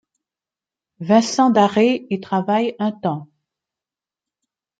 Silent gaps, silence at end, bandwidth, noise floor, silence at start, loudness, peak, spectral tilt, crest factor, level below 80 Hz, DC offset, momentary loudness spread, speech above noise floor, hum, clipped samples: none; 1.55 s; 9.2 kHz; -90 dBFS; 1 s; -18 LUFS; -2 dBFS; -5.5 dB/octave; 18 dB; -70 dBFS; under 0.1%; 11 LU; 72 dB; none; under 0.1%